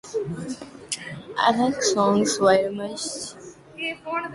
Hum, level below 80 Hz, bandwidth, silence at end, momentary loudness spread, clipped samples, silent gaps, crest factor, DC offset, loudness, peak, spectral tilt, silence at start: none; -60 dBFS; 11.5 kHz; 0 s; 16 LU; under 0.1%; none; 18 dB; under 0.1%; -24 LUFS; -6 dBFS; -3.5 dB/octave; 0.05 s